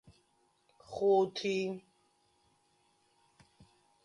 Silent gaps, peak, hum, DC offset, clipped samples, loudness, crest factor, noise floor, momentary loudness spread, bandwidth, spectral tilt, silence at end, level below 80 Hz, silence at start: none; -18 dBFS; none; under 0.1%; under 0.1%; -32 LUFS; 20 dB; -73 dBFS; 18 LU; 10.5 kHz; -5.5 dB/octave; 2.25 s; -76 dBFS; 0.9 s